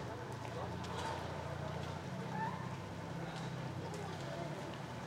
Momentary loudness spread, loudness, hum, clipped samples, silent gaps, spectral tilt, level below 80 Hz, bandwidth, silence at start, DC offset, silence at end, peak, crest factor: 4 LU; -44 LUFS; none; under 0.1%; none; -6 dB/octave; -66 dBFS; 16 kHz; 0 s; under 0.1%; 0 s; -30 dBFS; 14 dB